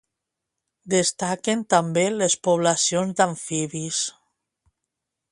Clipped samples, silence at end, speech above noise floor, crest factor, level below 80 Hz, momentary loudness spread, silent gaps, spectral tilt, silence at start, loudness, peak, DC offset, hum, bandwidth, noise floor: under 0.1%; 1.2 s; 61 dB; 22 dB; -68 dBFS; 7 LU; none; -3.5 dB/octave; 0.85 s; -22 LUFS; -4 dBFS; under 0.1%; none; 11.5 kHz; -83 dBFS